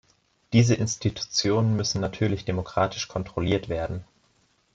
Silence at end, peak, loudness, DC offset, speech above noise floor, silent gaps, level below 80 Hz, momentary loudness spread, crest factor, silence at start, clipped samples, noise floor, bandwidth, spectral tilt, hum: 0.7 s; -8 dBFS; -25 LUFS; under 0.1%; 41 dB; none; -50 dBFS; 9 LU; 18 dB; 0.5 s; under 0.1%; -66 dBFS; 7.8 kHz; -5 dB/octave; none